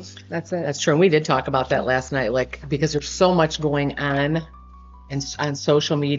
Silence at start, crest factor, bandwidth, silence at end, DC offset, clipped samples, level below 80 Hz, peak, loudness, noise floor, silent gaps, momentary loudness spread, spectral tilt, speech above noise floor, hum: 0 s; 18 dB; 7.8 kHz; 0 s; under 0.1%; under 0.1%; -44 dBFS; -4 dBFS; -21 LUFS; -43 dBFS; none; 10 LU; -4.5 dB/octave; 22 dB; none